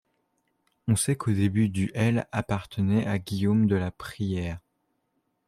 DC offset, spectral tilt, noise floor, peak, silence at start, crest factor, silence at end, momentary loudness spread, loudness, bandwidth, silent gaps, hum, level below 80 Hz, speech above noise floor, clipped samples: under 0.1%; -6 dB/octave; -75 dBFS; -12 dBFS; 0.85 s; 16 dB; 0.9 s; 10 LU; -27 LUFS; 14 kHz; none; none; -56 dBFS; 50 dB; under 0.1%